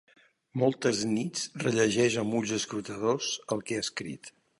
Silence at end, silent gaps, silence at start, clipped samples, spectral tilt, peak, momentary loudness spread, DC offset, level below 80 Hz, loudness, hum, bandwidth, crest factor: 0.3 s; none; 0.55 s; under 0.1%; -4 dB/octave; -12 dBFS; 9 LU; under 0.1%; -68 dBFS; -29 LUFS; none; 11.5 kHz; 18 dB